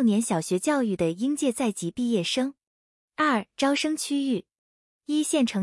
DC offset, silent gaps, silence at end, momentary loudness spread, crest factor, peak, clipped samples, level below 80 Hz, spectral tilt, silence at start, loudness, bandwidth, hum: under 0.1%; 2.67-3.08 s, 4.58-5.00 s; 0 s; 5 LU; 16 dB; -10 dBFS; under 0.1%; -66 dBFS; -4 dB/octave; 0 s; -26 LUFS; 12 kHz; none